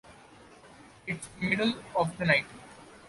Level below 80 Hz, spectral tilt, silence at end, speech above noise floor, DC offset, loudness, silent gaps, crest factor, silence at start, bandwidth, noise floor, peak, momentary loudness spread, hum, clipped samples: -62 dBFS; -5 dB/octave; 0 s; 24 dB; under 0.1%; -29 LUFS; none; 24 dB; 0.1 s; 11.5 kHz; -54 dBFS; -8 dBFS; 20 LU; none; under 0.1%